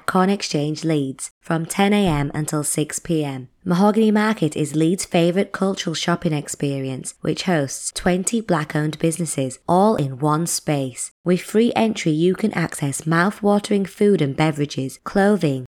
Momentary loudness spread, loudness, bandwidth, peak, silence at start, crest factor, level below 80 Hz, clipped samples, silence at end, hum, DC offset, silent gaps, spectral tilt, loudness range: 7 LU; -20 LUFS; 16.5 kHz; -4 dBFS; 0.1 s; 16 dB; -48 dBFS; under 0.1%; 0 s; none; under 0.1%; 1.31-1.41 s, 11.11-11.24 s; -5 dB/octave; 3 LU